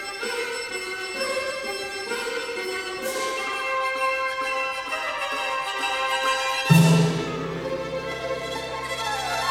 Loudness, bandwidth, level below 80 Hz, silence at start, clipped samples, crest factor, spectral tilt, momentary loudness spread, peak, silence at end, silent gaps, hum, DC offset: -25 LUFS; 17 kHz; -56 dBFS; 0 s; under 0.1%; 22 dB; -4.5 dB/octave; 9 LU; -4 dBFS; 0 s; none; none; under 0.1%